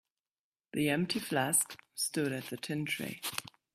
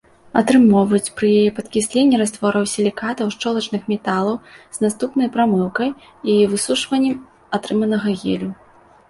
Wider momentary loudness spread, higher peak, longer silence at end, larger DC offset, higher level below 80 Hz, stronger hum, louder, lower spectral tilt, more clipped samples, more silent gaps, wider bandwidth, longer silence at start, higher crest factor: about the same, 10 LU vs 9 LU; second, -12 dBFS vs -2 dBFS; second, 0.25 s vs 0.55 s; neither; second, -74 dBFS vs -56 dBFS; neither; second, -33 LUFS vs -18 LUFS; second, -3 dB/octave vs -5 dB/octave; neither; neither; first, 16 kHz vs 11.5 kHz; first, 0.75 s vs 0.35 s; first, 22 dB vs 16 dB